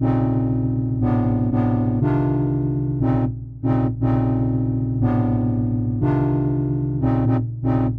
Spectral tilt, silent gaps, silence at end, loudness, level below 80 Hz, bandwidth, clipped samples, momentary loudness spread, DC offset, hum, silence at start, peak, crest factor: -12 dB/octave; none; 0 s; -21 LUFS; -36 dBFS; 3.6 kHz; under 0.1%; 3 LU; under 0.1%; none; 0 s; -8 dBFS; 12 dB